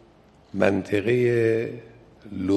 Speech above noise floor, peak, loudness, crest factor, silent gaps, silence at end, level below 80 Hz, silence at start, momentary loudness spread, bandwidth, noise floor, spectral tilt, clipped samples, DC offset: 32 dB; -4 dBFS; -23 LUFS; 20 dB; none; 0 s; -54 dBFS; 0.55 s; 16 LU; 12 kHz; -54 dBFS; -7.5 dB/octave; under 0.1%; under 0.1%